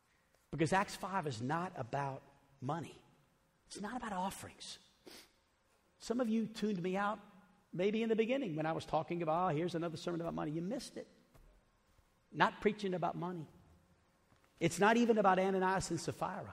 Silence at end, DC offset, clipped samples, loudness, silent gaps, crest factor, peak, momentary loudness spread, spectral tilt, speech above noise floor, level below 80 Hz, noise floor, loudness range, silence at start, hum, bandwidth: 0 s; under 0.1%; under 0.1%; -37 LUFS; none; 24 dB; -14 dBFS; 18 LU; -5.5 dB/octave; 38 dB; -68 dBFS; -74 dBFS; 9 LU; 0.5 s; none; 15.5 kHz